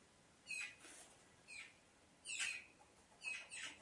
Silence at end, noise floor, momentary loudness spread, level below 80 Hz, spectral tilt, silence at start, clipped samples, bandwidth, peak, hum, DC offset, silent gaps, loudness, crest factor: 0 s; -70 dBFS; 24 LU; -86 dBFS; 1 dB/octave; 0 s; under 0.1%; 11.5 kHz; -32 dBFS; none; under 0.1%; none; -48 LUFS; 22 dB